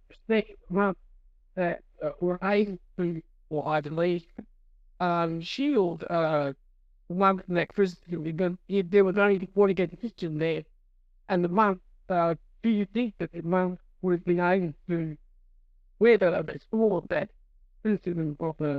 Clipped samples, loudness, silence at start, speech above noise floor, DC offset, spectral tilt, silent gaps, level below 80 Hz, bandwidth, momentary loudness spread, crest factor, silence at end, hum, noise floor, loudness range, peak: under 0.1%; -28 LUFS; 0.3 s; 34 dB; under 0.1%; -8.5 dB/octave; none; -58 dBFS; 7.6 kHz; 10 LU; 18 dB; 0 s; none; -61 dBFS; 4 LU; -10 dBFS